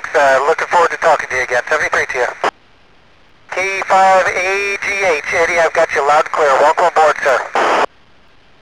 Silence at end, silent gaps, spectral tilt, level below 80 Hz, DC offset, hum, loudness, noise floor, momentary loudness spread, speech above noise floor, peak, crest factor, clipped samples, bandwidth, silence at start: 0.75 s; none; -2 dB/octave; -50 dBFS; 0.4%; none; -13 LUFS; -49 dBFS; 6 LU; 36 dB; -2 dBFS; 12 dB; under 0.1%; 14 kHz; 0 s